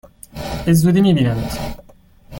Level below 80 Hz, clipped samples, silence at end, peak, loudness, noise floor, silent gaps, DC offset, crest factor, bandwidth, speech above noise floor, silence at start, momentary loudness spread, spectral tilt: -36 dBFS; under 0.1%; 0 s; -2 dBFS; -17 LUFS; -44 dBFS; none; under 0.1%; 14 dB; 17 kHz; 29 dB; 0.35 s; 17 LU; -6.5 dB/octave